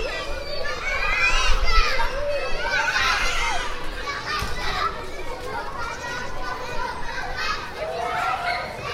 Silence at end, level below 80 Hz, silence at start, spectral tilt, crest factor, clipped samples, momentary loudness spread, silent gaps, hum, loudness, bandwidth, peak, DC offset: 0 s; -30 dBFS; 0 s; -2.5 dB/octave; 20 dB; under 0.1%; 11 LU; none; none; -25 LUFS; 13.5 kHz; -4 dBFS; under 0.1%